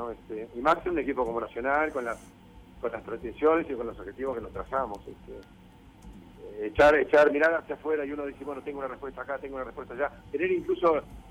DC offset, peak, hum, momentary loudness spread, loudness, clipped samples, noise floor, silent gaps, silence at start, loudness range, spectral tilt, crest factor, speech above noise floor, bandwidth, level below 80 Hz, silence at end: under 0.1%; -12 dBFS; none; 17 LU; -28 LUFS; under 0.1%; -50 dBFS; none; 0 s; 6 LU; -6 dB/octave; 18 dB; 22 dB; 13 kHz; -52 dBFS; 0 s